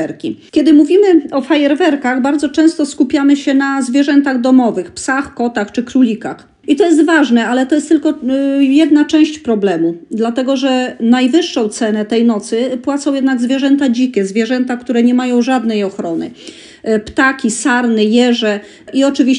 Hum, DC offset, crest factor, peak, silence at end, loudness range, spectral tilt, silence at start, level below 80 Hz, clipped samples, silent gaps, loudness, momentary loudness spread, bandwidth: none; under 0.1%; 12 dB; 0 dBFS; 0 s; 3 LU; -4.5 dB/octave; 0 s; -54 dBFS; under 0.1%; none; -13 LUFS; 8 LU; 11 kHz